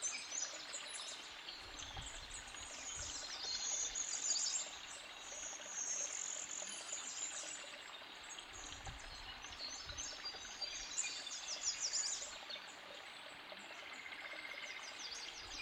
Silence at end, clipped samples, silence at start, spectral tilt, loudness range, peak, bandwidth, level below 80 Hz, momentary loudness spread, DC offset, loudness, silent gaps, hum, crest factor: 0 s; under 0.1%; 0 s; 1 dB/octave; 7 LU; -26 dBFS; 16 kHz; -66 dBFS; 12 LU; under 0.1%; -43 LUFS; none; none; 20 dB